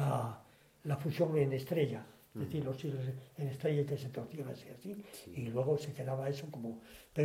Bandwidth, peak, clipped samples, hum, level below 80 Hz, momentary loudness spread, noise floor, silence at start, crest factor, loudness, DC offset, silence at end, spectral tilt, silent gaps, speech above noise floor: 16 kHz; -20 dBFS; under 0.1%; none; -70 dBFS; 13 LU; -61 dBFS; 0 s; 18 dB; -38 LUFS; under 0.1%; 0 s; -7.5 dB/octave; none; 24 dB